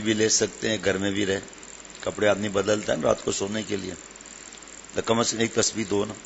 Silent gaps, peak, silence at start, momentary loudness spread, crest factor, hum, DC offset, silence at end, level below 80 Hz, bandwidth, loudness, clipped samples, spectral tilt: none; -4 dBFS; 0 s; 18 LU; 22 dB; none; under 0.1%; 0 s; -56 dBFS; 8.2 kHz; -25 LUFS; under 0.1%; -3 dB/octave